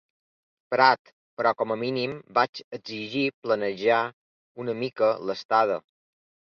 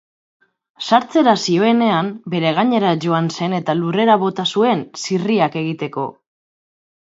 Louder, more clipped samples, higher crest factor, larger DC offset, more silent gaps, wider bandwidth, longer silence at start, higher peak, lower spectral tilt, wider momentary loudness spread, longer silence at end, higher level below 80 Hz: second, -26 LUFS vs -17 LUFS; neither; about the same, 22 dB vs 18 dB; neither; first, 0.99-1.05 s, 1.13-1.37 s, 2.49-2.53 s, 2.64-2.71 s, 3.34-3.42 s, 4.13-4.55 s, 5.45-5.49 s vs none; second, 6.8 kHz vs 8 kHz; about the same, 0.7 s vs 0.8 s; second, -4 dBFS vs 0 dBFS; about the same, -6 dB/octave vs -5.5 dB/octave; first, 13 LU vs 9 LU; second, 0.7 s vs 0.9 s; second, -74 dBFS vs -66 dBFS